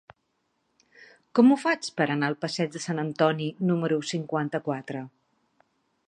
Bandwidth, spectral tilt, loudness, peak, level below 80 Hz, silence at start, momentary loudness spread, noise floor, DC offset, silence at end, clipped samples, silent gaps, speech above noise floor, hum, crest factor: 10 kHz; -6 dB/octave; -26 LUFS; -6 dBFS; -76 dBFS; 1 s; 12 LU; -75 dBFS; under 0.1%; 1 s; under 0.1%; none; 50 dB; none; 22 dB